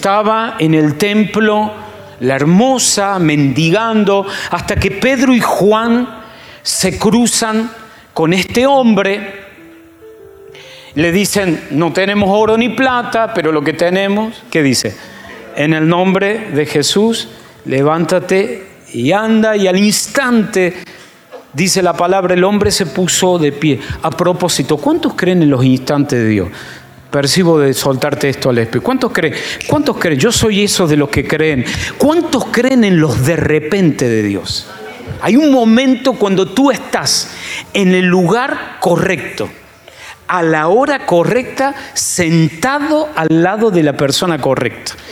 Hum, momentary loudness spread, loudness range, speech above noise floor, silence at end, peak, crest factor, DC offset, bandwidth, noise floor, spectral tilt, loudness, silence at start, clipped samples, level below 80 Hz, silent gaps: none; 9 LU; 2 LU; 26 dB; 0 s; 0 dBFS; 12 dB; under 0.1%; 17.5 kHz; -38 dBFS; -4.5 dB/octave; -12 LUFS; 0 s; under 0.1%; -42 dBFS; none